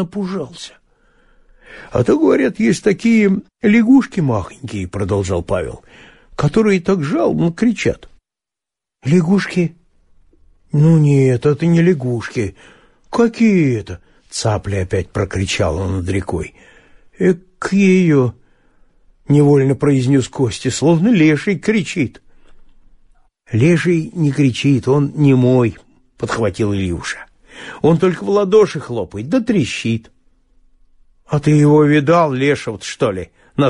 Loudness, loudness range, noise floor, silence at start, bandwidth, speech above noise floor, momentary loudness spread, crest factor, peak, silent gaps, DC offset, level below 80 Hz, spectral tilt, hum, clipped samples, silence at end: -15 LUFS; 4 LU; -87 dBFS; 0 s; 11.5 kHz; 73 dB; 13 LU; 14 dB; -2 dBFS; none; under 0.1%; -44 dBFS; -7 dB/octave; none; under 0.1%; 0 s